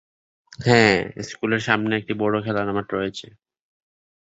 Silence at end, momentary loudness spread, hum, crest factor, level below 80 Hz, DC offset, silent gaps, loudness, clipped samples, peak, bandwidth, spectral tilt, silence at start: 1 s; 13 LU; none; 22 dB; -54 dBFS; under 0.1%; none; -21 LUFS; under 0.1%; -2 dBFS; 8 kHz; -5.5 dB/octave; 0.6 s